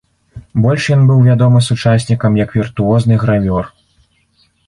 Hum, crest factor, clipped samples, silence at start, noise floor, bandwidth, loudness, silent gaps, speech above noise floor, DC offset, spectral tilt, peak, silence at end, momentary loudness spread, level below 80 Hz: none; 10 dB; under 0.1%; 0.35 s; -56 dBFS; 11 kHz; -12 LUFS; none; 45 dB; under 0.1%; -7.5 dB/octave; -2 dBFS; 1 s; 8 LU; -38 dBFS